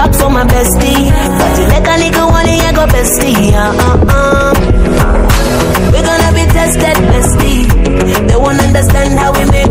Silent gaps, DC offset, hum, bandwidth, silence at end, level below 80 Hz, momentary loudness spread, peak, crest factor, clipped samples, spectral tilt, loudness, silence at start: none; under 0.1%; none; 16.5 kHz; 0 s; -12 dBFS; 2 LU; 0 dBFS; 8 dB; under 0.1%; -5 dB/octave; -9 LUFS; 0 s